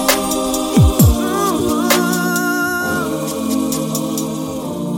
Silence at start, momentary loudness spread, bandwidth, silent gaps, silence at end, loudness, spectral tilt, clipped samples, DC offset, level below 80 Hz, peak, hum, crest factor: 0 s; 8 LU; 17 kHz; none; 0 s; -16 LUFS; -4.5 dB/octave; under 0.1%; under 0.1%; -28 dBFS; 0 dBFS; none; 16 dB